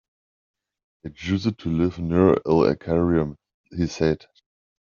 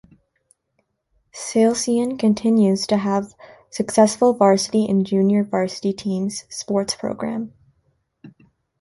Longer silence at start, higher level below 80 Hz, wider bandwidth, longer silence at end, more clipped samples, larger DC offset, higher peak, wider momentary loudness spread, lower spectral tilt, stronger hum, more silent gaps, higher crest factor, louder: second, 1.05 s vs 1.35 s; first, -48 dBFS vs -60 dBFS; second, 7.2 kHz vs 11.5 kHz; first, 0.75 s vs 0.5 s; neither; neither; about the same, -4 dBFS vs -4 dBFS; about the same, 14 LU vs 13 LU; first, -7 dB/octave vs -5.5 dB/octave; neither; first, 3.54-3.64 s vs none; about the same, 20 dB vs 18 dB; about the same, -22 LUFS vs -20 LUFS